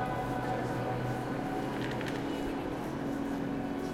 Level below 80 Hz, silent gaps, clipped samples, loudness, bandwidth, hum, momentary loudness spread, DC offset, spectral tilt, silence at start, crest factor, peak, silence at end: -52 dBFS; none; under 0.1%; -35 LUFS; 16.5 kHz; none; 2 LU; under 0.1%; -6.5 dB/octave; 0 s; 14 dB; -20 dBFS; 0 s